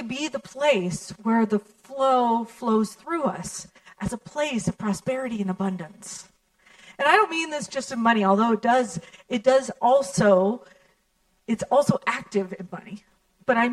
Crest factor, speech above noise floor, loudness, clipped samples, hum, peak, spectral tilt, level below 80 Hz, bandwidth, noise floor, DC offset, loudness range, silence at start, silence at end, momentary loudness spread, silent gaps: 22 dB; 44 dB; -24 LUFS; under 0.1%; none; -2 dBFS; -5 dB/octave; -60 dBFS; 13 kHz; -68 dBFS; under 0.1%; 7 LU; 0 s; 0 s; 17 LU; none